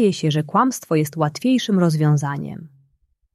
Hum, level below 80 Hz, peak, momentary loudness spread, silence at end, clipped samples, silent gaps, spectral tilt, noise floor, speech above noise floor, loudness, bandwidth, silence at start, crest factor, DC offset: none; -62 dBFS; -4 dBFS; 11 LU; 0.7 s; under 0.1%; none; -6.5 dB/octave; -64 dBFS; 46 dB; -19 LUFS; 13 kHz; 0 s; 16 dB; under 0.1%